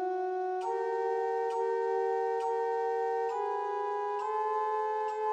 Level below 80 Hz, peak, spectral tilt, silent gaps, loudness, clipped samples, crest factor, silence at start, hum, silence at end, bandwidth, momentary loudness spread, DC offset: under -90 dBFS; -22 dBFS; -3 dB/octave; none; -32 LUFS; under 0.1%; 10 dB; 0 s; none; 0 s; 8.8 kHz; 3 LU; under 0.1%